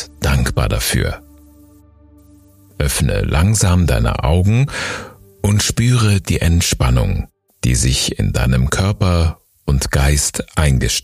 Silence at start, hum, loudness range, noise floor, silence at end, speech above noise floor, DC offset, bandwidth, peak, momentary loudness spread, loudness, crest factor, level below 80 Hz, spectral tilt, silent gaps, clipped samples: 0 s; none; 3 LU; -46 dBFS; 0.05 s; 31 dB; under 0.1%; 15.5 kHz; 0 dBFS; 8 LU; -16 LUFS; 16 dB; -22 dBFS; -4.5 dB/octave; none; under 0.1%